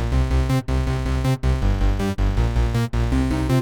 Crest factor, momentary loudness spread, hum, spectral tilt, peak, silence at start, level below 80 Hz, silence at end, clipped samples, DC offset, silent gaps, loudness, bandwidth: 12 dB; 2 LU; none; -7 dB/octave; -8 dBFS; 0 s; -22 dBFS; 0 s; under 0.1%; 0.3%; none; -22 LUFS; 14.5 kHz